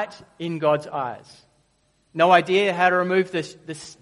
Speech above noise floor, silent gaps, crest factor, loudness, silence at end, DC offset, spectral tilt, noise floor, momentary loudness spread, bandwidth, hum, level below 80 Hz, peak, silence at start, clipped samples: 43 dB; none; 22 dB; -21 LUFS; 0.1 s; under 0.1%; -5 dB/octave; -65 dBFS; 19 LU; 11.5 kHz; none; -68 dBFS; -2 dBFS; 0 s; under 0.1%